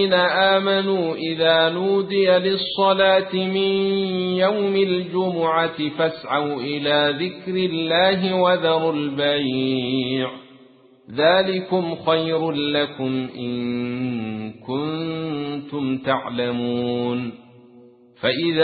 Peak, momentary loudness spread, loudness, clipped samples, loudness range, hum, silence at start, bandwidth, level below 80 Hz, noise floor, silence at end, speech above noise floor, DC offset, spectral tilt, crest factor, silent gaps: -4 dBFS; 9 LU; -21 LUFS; under 0.1%; 6 LU; none; 0 s; 4.8 kHz; -60 dBFS; -51 dBFS; 0 s; 30 dB; under 0.1%; -10.5 dB/octave; 16 dB; none